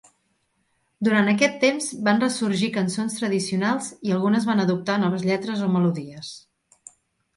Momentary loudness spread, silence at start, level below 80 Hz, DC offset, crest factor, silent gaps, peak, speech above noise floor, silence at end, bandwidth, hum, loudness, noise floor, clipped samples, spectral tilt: 7 LU; 1 s; -68 dBFS; under 0.1%; 18 dB; none; -4 dBFS; 48 dB; 1 s; 11.5 kHz; none; -22 LUFS; -70 dBFS; under 0.1%; -5 dB/octave